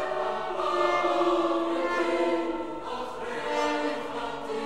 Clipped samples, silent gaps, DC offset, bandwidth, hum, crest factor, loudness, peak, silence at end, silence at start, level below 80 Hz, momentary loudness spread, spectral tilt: under 0.1%; none; 0.6%; 11.5 kHz; none; 16 dB; -28 LUFS; -12 dBFS; 0 s; 0 s; -60 dBFS; 9 LU; -4 dB/octave